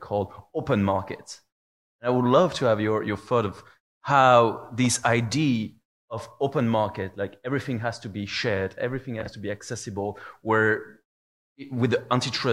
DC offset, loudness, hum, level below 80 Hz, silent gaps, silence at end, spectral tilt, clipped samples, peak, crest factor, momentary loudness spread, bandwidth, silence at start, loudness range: under 0.1%; -25 LUFS; none; -62 dBFS; 1.52-1.99 s, 3.80-4.01 s, 5.85-6.08 s, 11.05-11.56 s; 0 s; -5 dB/octave; under 0.1%; -4 dBFS; 20 dB; 14 LU; 12.5 kHz; 0 s; 7 LU